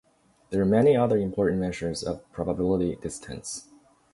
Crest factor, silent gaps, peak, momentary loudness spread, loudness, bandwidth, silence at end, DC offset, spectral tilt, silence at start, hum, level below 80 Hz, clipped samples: 18 dB; none; -10 dBFS; 15 LU; -26 LUFS; 11.5 kHz; 0.5 s; under 0.1%; -6.5 dB/octave; 0.5 s; none; -50 dBFS; under 0.1%